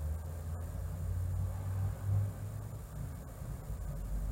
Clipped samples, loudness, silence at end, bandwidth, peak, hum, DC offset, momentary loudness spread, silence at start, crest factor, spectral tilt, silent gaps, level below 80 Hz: under 0.1%; -40 LUFS; 0 s; 16 kHz; -24 dBFS; none; under 0.1%; 10 LU; 0 s; 14 dB; -7.5 dB/octave; none; -44 dBFS